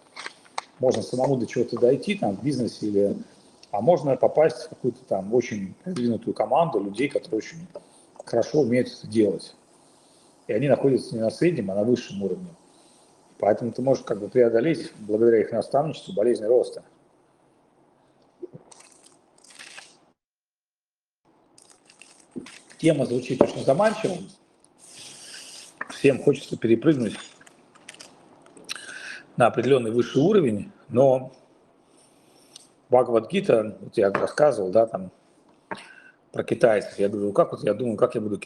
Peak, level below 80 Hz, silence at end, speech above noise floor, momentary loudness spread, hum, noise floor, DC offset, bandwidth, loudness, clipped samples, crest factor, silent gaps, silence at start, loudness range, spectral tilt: 0 dBFS; -68 dBFS; 0.05 s; over 67 dB; 20 LU; none; under -90 dBFS; under 0.1%; 12 kHz; -23 LUFS; under 0.1%; 24 dB; none; 0.15 s; 4 LU; -6.5 dB/octave